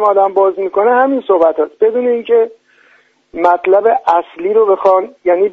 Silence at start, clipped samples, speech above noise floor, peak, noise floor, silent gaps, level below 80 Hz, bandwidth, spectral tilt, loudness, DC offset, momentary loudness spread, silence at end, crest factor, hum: 0 s; under 0.1%; 39 dB; 0 dBFS; -51 dBFS; none; -60 dBFS; 6 kHz; -6.5 dB/octave; -12 LUFS; under 0.1%; 5 LU; 0 s; 12 dB; none